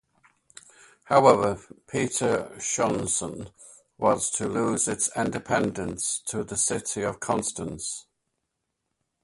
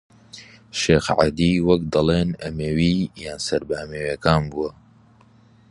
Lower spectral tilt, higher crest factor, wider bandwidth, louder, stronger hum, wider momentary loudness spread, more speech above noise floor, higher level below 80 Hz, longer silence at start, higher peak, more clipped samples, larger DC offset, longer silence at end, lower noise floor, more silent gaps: second, -3.5 dB/octave vs -6 dB/octave; about the same, 24 dB vs 22 dB; about the same, 12 kHz vs 11.5 kHz; second, -25 LUFS vs -21 LUFS; neither; about the same, 12 LU vs 12 LU; first, 55 dB vs 32 dB; second, -56 dBFS vs -40 dBFS; first, 1.05 s vs 0.35 s; second, -4 dBFS vs 0 dBFS; neither; neither; first, 1.2 s vs 1 s; first, -80 dBFS vs -53 dBFS; neither